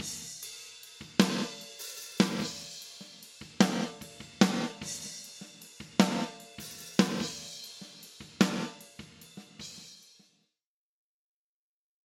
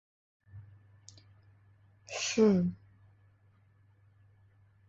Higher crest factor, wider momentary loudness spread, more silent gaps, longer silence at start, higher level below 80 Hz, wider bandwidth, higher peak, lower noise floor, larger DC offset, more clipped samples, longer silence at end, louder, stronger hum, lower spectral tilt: first, 30 dB vs 22 dB; second, 20 LU vs 28 LU; neither; second, 0 s vs 0.55 s; about the same, -70 dBFS vs -68 dBFS; first, 16.5 kHz vs 8 kHz; first, -4 dBFS vs -14 dBFS; first, under -90 dBFS vs -65 dBFS; neither; neither; about the same, 2.05 s vs 2.15 s; second, -32 LUFS vs -29 LUFS; neither; about the same, -4 dB/octave vs -5 dB/octave